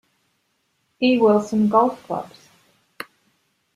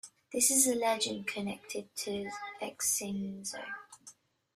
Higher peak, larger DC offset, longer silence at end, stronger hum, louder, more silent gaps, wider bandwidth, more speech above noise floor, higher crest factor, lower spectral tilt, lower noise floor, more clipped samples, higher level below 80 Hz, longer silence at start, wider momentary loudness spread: first, -4 dBFS vs -12 dBFS; neither; first, 1.5 s vs 0.45 s; neither; first, -19 LUFS vs -32 LUFS; neither; second, 13.5 kHz vs 15.5 kHz; first, 51 dB vs 25 dB; about the same, 20 dB vs 22 dB; first, -6.5 dB/octave vs -2 dB/octave; first, -69 dBFS vs -59 dBFS; neither; first, -66 dBFS vs -74 dBFS; first, 1 s vs 0.05 s; first, 21 LU vs 16 LU